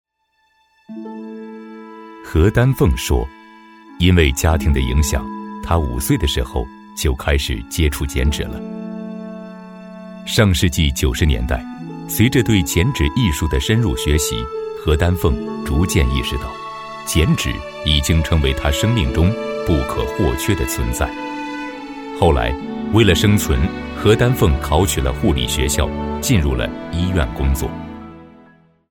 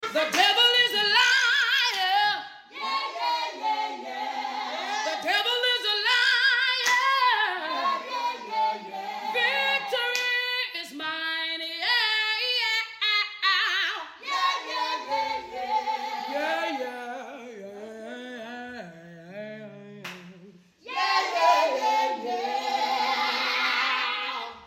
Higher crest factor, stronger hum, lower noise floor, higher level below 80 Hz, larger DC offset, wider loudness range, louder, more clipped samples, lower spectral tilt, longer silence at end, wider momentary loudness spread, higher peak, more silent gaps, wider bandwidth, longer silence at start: about the same, 16 dB vs 18 dB; neither; first, -64 dBFS vs -52 dBFS; first, -26 dBFS vs -76 dBFS; neither; second, 4 LU vs 11 LU; first, -18 LUFS vs -24 LUFS; neither; first, -5 dB/octave vs -0.5 dB/octave; first, 0.6 s vs 0 s; about the same, 16 LU vs 18 LU; first, -2 dBFS vs -8 dBFS; neither; about the same, 18 kHz vs 16.5 kHz; first, 0.9 s vs 0 s